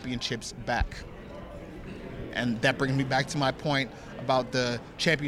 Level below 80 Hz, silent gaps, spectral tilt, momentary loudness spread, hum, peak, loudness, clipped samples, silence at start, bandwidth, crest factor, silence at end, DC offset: -44 dBFS; none; -5 dB/octave; 16 LU; none; -10 dBFS; -29 LUFS; under 0.1%; 0 s; 15 kHz; 20 dB; 0 s; under 0.1%